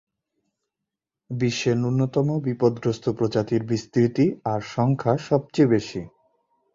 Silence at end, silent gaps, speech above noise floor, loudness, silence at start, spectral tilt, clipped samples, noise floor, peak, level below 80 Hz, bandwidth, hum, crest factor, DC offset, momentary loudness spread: 0.65 s; none; 63 dB; -23 LUFS; 1.3 s; -7 dB/octave; under 0.1%; -85 dBFS; -6 dBFS; -58 dBFS; 7.6 kHz; none; 18 dB; under 0.1%; 7 LU